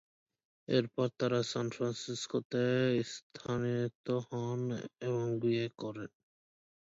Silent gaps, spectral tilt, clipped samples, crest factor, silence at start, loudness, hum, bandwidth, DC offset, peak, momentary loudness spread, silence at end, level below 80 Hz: 2.45-2.50 s, 3.23-3.30 s, 3.95-4.04 s; -6 dB/octave; under 0.1%; 20 dB; 0.7 s; -35 LUFS; none; 8 kHz; under 0.1%; -16 dBFS; 11 LU; 0.75 s; -72 dBFS